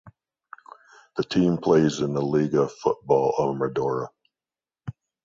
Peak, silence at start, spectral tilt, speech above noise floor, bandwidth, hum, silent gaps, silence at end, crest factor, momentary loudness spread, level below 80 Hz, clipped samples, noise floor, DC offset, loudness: -6 dBFS; 0.05 s; -7 dB/octave; over 68 dB; 7.6 kHz; none; none; 0.35 s; 18 dB; 19 LU; -60 dBFS; under 0.1%; under -90 dBFS; under 0.1%; -23 LUFS